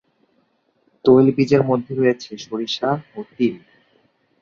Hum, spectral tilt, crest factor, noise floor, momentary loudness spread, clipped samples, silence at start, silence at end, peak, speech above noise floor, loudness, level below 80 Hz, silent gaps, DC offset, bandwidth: none; -7 dB/octave; 18 dB; -64 dBFS; 14 LU; under 0.1%; 1.05 s; 0.85 s; -2 dBFS; 46 dB; -19 LUFS; -60 dBFS; none; under 0.1%; 7.2 kHz